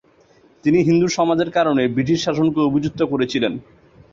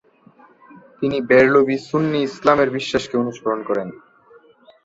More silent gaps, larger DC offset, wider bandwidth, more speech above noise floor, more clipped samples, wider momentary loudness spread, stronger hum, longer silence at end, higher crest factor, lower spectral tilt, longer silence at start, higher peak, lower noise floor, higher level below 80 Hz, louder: neither; neither; about the same, 7.6 kHz vs 8 kHz; about the same, 35 dB vs 33 dB; neither; second, 6 LU vs 11 LU; neither; second, 0.5 s vs 0.9 s; about the same, 14 dB vs 18 dB; about the same, -6 dB/octave vs -6 dB/octave; second, 0.65 s vs 1 s; about the same, -4 dBFS vs -2 dBFS; about the same, -53 dBFS vs -51 dBFS; about the same, -52 dBFS vs -56 dBFS; about the same, -18 LUFS vs -18 LUFS